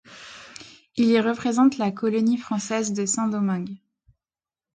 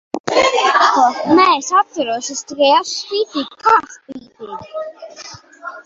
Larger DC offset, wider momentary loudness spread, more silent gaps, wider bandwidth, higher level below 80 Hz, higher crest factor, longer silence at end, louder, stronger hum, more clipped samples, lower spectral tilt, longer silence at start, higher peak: neither; about the same, 21 LU vs 21 LU; second, none vs 0.20-0.24 s; first, 9.6 kHz vs 8 kHz; second, -66 dBFS vs -60 dBFS; about the same, 16 dB vs 16 dB; first, 1 s vs 0.05 s; second, -23 LUFS vs -14 LUFS; neither; neither; first, -5 dB/octave vs -2 dB/octave; about the same, 0.1 s vs 0.15 s; second, -8 dBFS vs 0 dBFS